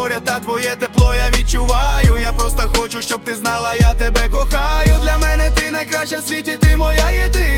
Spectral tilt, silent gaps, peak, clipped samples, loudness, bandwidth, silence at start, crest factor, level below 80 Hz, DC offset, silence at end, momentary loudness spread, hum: -4.5 dB/octave; none; 0 dBFS; under 0.1%; -16 LUFS; 17 kHz; 0 s; 14 dB; -16 dBFS; under 0.1%; 0 s; 5 LU; none